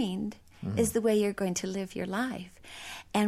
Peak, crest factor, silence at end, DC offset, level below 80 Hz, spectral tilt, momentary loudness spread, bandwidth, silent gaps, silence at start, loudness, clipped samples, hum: -16 dBFS; 16 dB; 0 s; under 0.1%; -58 dBFS; -5 dB/octave; 15 LU; 16 kHz; none; 0 s; -31 LUFS; under 0.1%; none